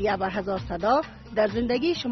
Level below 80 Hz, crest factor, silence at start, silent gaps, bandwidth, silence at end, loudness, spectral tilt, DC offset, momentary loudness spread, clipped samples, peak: -46 dBFS; 16 dB; 0 s; none; 6.2 kHz; 0 s; -26 LUFS; -4 dB/octave; under 0.1%; 6 LU; under 0.1%; -10 dBFS